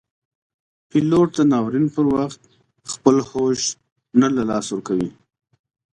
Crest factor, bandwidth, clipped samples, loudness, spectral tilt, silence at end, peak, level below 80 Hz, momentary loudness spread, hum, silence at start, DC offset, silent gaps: 20 dB; 10.5 kHz; under 0.1%; -20 LUFS; -5.5 dB/octave; 0.85 s; 0 dBFS; -56 dBFS; 11 LU; none; 0.95 s; under 0.1%; 3.92-3.96 s